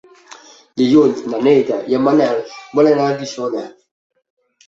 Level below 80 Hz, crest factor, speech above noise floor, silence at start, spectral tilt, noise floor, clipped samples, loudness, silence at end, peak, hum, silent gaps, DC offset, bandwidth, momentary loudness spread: -60 dBFS; 16 dB; 27 dB; 0.75 s; -6.5 dB/octave; -42 dBFS; under 0.1%; -15 LUFS; 1 s; -2 dBFS; none; none; under 0.1%; 7.8 kHz; 11 LU